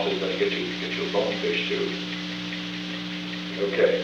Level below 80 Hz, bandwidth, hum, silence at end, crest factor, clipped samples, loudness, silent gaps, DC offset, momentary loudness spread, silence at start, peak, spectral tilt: -60 dBFS; 9.8 kHz; 60 Hz at -40 dBFS; 0 s; 18 dB; under 0.1%; -27 LUFS; none; under 0.1%; 7 LU; 0 s; -8 dBFS; -5 dB/octave